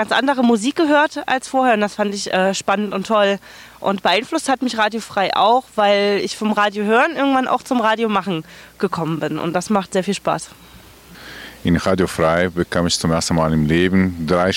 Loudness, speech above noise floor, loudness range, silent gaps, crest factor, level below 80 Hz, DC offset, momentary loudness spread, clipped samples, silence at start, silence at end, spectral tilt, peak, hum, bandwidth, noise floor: -18 LUFS; 25 dB; 5 LU; none; 14 dB; -44 dBFS; under 0.1%; 7 LU; under 0.1%; 0 s; 0 s; -5 dB/octave; -4 dBFS; none; 17 kHz; -43 dBFS